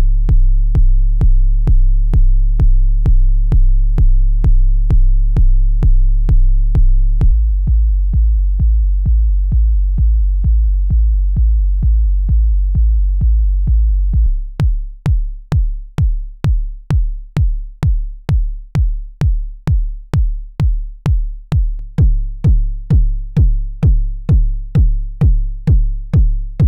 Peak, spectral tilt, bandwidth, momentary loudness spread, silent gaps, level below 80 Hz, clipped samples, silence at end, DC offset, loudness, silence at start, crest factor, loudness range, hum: -2 dBFS; -9.5 dB/octave; 2.7 kHz; 4 LU; none; -12 dBFS; under 0.1%; 0 s; under 0.1%; -17 LUFS; 0 s; 8 dB; 4 LU; none